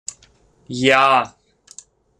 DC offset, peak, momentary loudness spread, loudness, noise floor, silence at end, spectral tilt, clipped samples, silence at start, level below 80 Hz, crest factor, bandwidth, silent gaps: under 0.1%; -2 dBFS; 19 LU; -15 LUFS; -55 dBFS; 0.9 s; -3.5 dB/octave; under 0.1%; 0.7 s; -60 dBFS; 18 dB; 13.5 kHz; none